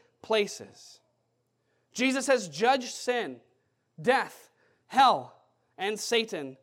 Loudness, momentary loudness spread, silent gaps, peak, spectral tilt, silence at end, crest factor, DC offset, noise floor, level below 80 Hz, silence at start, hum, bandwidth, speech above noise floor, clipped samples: -28 LUFS; 14 LU; none; -10 dBFS; -2.5 dB/octave; 0.1 s; 20 dB; under 0.1%; -75 dBFS; -88 dBFS; 0.25 s; none; 16.5 kHz; 48 dB; under 0.1%